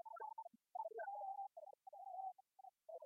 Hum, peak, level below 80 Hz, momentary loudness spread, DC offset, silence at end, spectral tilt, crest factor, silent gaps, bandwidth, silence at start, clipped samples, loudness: none; -38 dBFS; under -90 dBFS; 12 LU; under 0.1%; 0 s; -1.5 dB/octave; 14 dB; none; 6.6 kHz; 0.05 s; under 0.1%; -52 LUFS